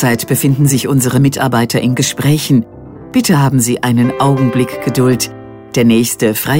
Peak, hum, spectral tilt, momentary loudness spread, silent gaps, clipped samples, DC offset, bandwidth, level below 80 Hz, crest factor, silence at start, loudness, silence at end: 0 dBFS; none; -5.5 dB/octave; 5 LU; none; under 0.1%; under 0.1%; 16.5 kHz; -46 dBFS; 12 dB; 0 s; -12 LUFS; 0 s